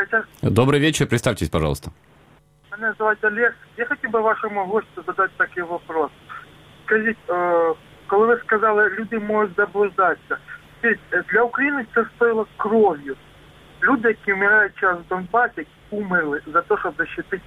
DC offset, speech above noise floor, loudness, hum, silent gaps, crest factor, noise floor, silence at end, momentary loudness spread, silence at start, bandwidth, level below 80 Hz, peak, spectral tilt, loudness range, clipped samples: under 0.1%; 33 dB; -20 LUFS; none; none; 20 dB; -53 dBFS; 0.05 s; 12 LU; 0 s; 15.5 kHz; -48 dBFS; -2 dBFS; -5.5 dB/octave; 3 LU; under 0.1%